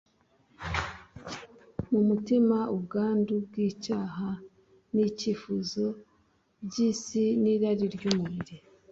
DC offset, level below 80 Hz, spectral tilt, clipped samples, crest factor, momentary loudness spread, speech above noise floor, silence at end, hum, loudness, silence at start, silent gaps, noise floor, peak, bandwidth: under 0.1%; -56 dBFS; -6 dB/octave; under 0.1%; 24 dB; 17 LU; 40 dB; 0.35 s; none; -29 LUFS; 0.6 s; none; -68 dBFS; -6 dBFS; 7.8 kHz